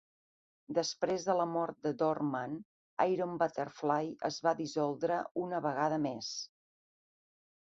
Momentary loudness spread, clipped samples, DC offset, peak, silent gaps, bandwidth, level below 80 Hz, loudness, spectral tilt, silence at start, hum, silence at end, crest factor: 8 LU; under 0.1%; under 0.1%; -14 dBFS; 2.65-2.97 s, 5.31-5.35 s; 7.6 kHz; -78 dBFS; -34 LUFS; -4.5 dB/octave; 0.7 s; none; 1.2 s; 20 dB